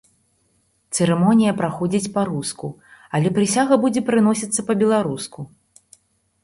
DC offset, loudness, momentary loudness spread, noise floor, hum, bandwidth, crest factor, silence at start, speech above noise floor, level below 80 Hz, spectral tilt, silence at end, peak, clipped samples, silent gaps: under 0.1%; -19 LUFS; 14 LU; -64 dBFS; none; 11.5 kHz; 18 dB; 0.9 s; 46 dB; -58 dBFS; -5.5 dB/octave; 0.95 s; -2 dBFS; under 0.1%; none